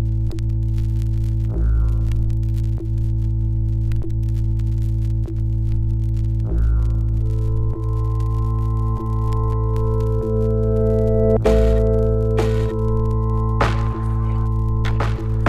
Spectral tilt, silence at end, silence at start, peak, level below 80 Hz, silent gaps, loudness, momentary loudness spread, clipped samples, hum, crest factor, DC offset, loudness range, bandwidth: -9 dB/octave; 0 s; 0 s; -2 dBFS; -22 dBFS; none; -21 LUFS; 5 LU; under 0.1%; none; 16 dB; under 0.1%; 3 LU; 7 kHz